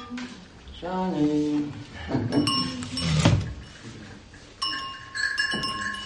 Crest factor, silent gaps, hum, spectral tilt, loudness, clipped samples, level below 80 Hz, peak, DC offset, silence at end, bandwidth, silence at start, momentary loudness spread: 22 dB; none; none; -5 dB/octave; -26 LUFS; under 0.1%; -46 dBFS; -6 dBFS; under 0.1%; 0 s; 11.5 kHz; 0 s; 20 LU